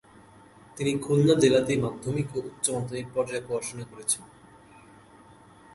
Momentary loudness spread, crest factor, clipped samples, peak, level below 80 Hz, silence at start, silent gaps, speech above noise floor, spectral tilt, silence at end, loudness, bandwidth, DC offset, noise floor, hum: 12 LU; 20 dB; under 0.1%; -8 dBFS; -60 dBFS; 0.75 s; none; 27 dB; -5 dB/octave; 1.5 s; -27 LUFS; 12 kHz; under 0.1%; -53 dBFS; none